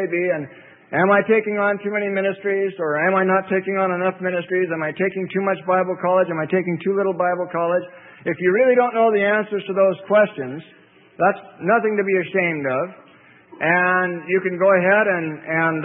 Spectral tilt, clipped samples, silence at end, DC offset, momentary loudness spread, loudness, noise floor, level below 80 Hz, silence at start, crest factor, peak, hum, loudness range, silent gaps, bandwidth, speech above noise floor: -11.5 dB/octave; under 0.1%; 0 s; under 0.1%; 8 LU; -20 LUFS; -49 dBFS; -72 dBFS; 0 s; 16 dB; -4 dBFS; none; 2 LU; none; 3.9 kHz; 30 dB